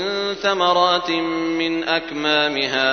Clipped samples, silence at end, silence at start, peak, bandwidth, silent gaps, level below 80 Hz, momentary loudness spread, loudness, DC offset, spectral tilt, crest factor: under 0.1%; 0 s; 0 s; -2 dBFS; 6.6 kHz; none; -56 dBFS; 5 LU; -19 LUFS; under 0.1%; -3.5 dB/octave; 18 dB